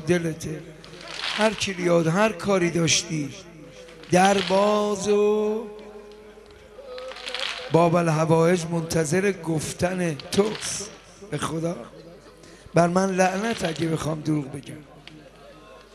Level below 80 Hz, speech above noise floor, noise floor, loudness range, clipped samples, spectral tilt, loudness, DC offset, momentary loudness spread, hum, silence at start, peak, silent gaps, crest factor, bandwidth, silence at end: -54 dBFS; 25 dB; -47 dBFS; 4 LU; under 0.1%; -4.5 dB/octave; -23 LUFS; under 0.1%; 21 LU; none; 0 s; -6 dBFS; none; 20 dB; 14 kHz; 0.15 s